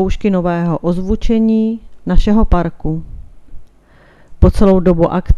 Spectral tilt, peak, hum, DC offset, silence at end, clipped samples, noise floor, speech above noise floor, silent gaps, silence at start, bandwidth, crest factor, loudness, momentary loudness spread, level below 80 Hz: -9 dB/octave; 0 dBFS; none; under 0.1%; 0 s; 0.3%; -46 dBFS; 34 dB; none; 0 s; 10 kHz; 12 dB; -15 LUFS; 9 LU; -20 dBFS